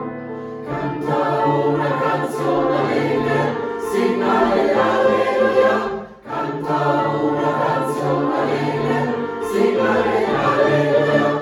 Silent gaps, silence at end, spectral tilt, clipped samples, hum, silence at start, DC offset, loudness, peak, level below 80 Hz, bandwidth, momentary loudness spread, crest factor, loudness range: none; 0 s; -6.5 dB/octave; under 0.1%; none; 0 s; under 0.1%; -18 LUFS; -4 dBFS; -52 dBFS; 17 kHz; 9 LU; 14 dB; 2 LU